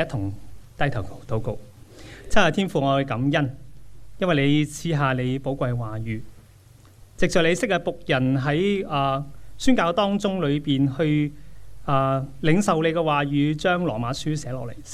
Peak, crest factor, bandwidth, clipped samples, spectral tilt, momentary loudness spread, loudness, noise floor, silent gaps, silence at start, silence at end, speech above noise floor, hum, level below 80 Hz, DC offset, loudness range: -2 dBFS; 20 dB; 14 kHz; under 0.1%; -6 dB/octave; 11 LU; -23 LUFS; -50 dBFS; none; 0 s; 0 s; 28 dB; none; -44 dBFS; under 0.1%; 3 LU